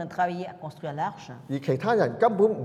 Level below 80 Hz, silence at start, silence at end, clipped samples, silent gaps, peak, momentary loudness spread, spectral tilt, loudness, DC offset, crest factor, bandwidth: -70 dBFS; 0 s; 0 s; under 0.1%; none; -8 dBFS; 15 LU; -7.5 dB/octave; -26 LUFS; under 0.1%; 18 dB; 11 kHz